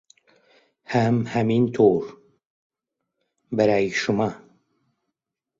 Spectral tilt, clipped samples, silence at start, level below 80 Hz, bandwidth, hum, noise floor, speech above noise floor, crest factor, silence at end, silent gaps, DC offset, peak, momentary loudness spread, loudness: -7 dB/octave; under 0.1%; 0.9 s; -60 dBFS; 7.6 kHz; none; -83 dBFS; 63 dB; 20 dB; 1.2 s; 2.45-2.70 s; under 0.1%; -6 dBFS; 9 LU; -22 LUFS